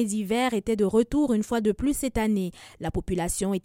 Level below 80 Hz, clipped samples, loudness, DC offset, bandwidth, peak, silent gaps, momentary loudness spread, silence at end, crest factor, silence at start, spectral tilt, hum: -42 dBFS; under 0.1%; -26 LUFS; under 0.1%; 16.5 kHz; -10 dBFS; none; 8 LU; 0.05 s; 16 dB; 0 s; -5.5 dB/octave; none